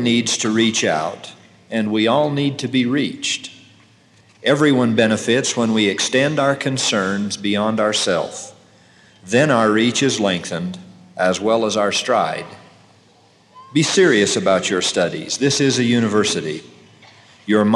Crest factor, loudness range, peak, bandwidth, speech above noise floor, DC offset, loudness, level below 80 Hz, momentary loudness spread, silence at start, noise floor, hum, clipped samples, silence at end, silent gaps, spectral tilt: 18 dB; 4 LU; -2 dBFS; 12 kHz; 35 dB; under 0.1%; -18 LUFS; -70 dBFS; 12 LU; 0 s; -52 dBFS; none; under 0.1%; 0 s; none; -4 dB/octave